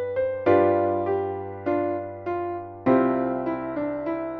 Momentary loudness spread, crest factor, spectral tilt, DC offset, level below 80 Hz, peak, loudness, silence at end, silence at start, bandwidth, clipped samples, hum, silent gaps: 11 LU; 16 dB; -7 dB/octave; under 0.1%; -60 dBFS; -8 dBFS; -25 LUFS; 0 s; 0 s; 4.9 kHz; under 0.1%; none; none